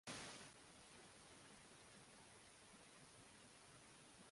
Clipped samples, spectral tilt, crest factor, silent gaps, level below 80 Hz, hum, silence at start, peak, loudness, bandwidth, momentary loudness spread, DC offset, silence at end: under 0.1%; -2.5 dB/octave; 24 dB; none; -82 dBFS; none; 0.05 s; -38 dBFS; -62 LUFS; 11.5 kHz; 8 LU; under 0.1%; 0 s